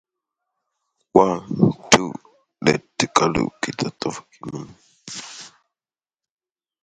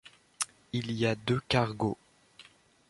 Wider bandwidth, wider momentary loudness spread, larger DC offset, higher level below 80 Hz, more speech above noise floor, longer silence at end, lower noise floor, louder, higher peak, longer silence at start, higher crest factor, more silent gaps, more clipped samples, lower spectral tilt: about the same, 11.5 kHz vs 11.5 kHz; first, 19 LU vs 8 LU; neither; first, -52 dBFS vs -60 dBFS; first, over 69 dB vs 28 dB; first, 1.35 s vs 0.45 s; first, under -90 dBFS vs -58 dBFS; first, -20 LUFS vs -31 LUFS; first, 0 dBFS vs -12 dBFS; first, 1.15 s vs 0.05 s; about the same, 24 dB vs 22 dB; neither; neither; about the same, -4 dB/octave vs -5 dB/octave